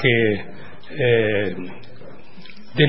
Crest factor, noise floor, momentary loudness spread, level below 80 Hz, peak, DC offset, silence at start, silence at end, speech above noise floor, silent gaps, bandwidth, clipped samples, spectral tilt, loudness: 22 dB; -44 dBFS; 25 LU; -54 dBFS; 0 dBFS; 3%; 0 s; 0 s; 24 dB; none; 5.8 kHz; under 0.1%; -10.5 dB/octave; -20 LUFS